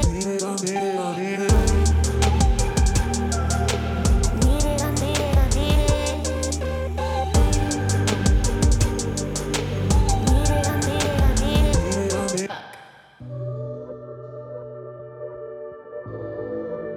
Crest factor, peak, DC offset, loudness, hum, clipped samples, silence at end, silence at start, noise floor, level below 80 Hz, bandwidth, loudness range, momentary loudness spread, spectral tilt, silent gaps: 16 dB; -6 dBFS; under 0.1%; -22 LUFS; none; under 0.1%; 0 s; 0 s; -45 dBFS; -24 dBFS; 16 kHz; 13 LU; 16 LU; -5 dB/octave; none